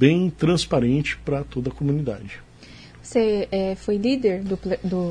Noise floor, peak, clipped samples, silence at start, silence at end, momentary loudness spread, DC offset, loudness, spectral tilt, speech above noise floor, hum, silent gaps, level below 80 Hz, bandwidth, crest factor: -45 dBFS; -4 dBFS; under 0.1%; 0 s; 0 s; 9 LU; under 0.1%; -23 LUFS; -6.5 dB/octave; 23 dB; none; none; -44 dBFS; 10.5 kHz; 18 dB